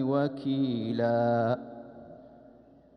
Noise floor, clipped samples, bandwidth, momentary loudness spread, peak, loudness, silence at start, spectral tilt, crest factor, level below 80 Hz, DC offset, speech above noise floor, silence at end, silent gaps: -56 dBFS; under 0.1%; 6 kHz; 22 LU; -14 dBFS; -29 LUFS; 0 s; -9.5 dB/octave; 16 dB; -70 dBFS; under 0.1%; 28 dB; 0.6 s; none